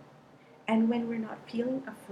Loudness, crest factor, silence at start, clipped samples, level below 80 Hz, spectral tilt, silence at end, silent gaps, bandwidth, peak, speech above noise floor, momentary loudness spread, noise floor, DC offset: -32 LUFS; 16 dB; 0 s; under 0.1%; -76 dBFS; -7 dB/octave; 0 s; none; 10.5 kHz; -16 dBFS; 26 dB; 10 LU; -56 dBFS; under 0.1%